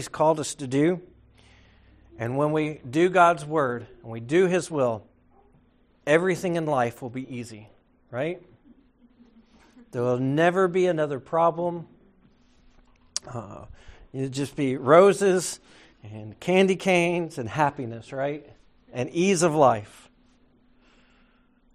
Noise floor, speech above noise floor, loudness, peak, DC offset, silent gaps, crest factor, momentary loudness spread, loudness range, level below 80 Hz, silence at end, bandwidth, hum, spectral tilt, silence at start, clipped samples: -61 dBFS; 37 dB; -24 LUFS; -4 dBFS; under 0.1%; none; 22 dB; 19 LU; 8 LU; -60 dBFS; 1.9 s; 13.5 kHz; none; -5.5 dB/octave; 0 s; under 0.1%